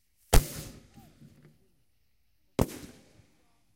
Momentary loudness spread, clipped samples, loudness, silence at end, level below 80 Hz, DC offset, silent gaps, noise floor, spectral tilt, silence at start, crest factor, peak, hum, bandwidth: 22 LU; under 0.1%; -31 LUFS; 1.05 s; -34 dBFS; under 0.1%; none; -75 dBFS; -4.5 dB/octave; 0.3 s; 26 dB; -6 dBFS; none; 16 kHz